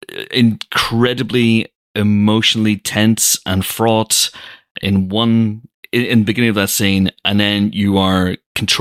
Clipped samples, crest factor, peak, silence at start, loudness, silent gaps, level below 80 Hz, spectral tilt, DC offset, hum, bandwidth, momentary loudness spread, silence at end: under 0.1%; 14 dB; 0 dBFS; 0.1 s; -15 LUFS; 1.75-1.94 s, 4.71-4.75 s, 5.74-5.83 s, 8.46-8.55 s; -48 dBFS; -4 dB/octave; under 0.1%; none; 16 kHz; 7 LU; 0 s